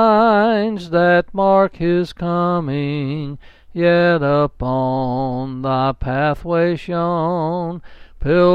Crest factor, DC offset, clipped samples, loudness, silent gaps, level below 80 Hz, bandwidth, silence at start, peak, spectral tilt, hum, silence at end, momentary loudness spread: 14 dB; under 0.1%; under 0.1%; -18 LUFS; none; -38 dBFS; 7.2 kHz; 0 s; -2 dBFS; -8.5 dB/octave; none; 0 s; 10 LU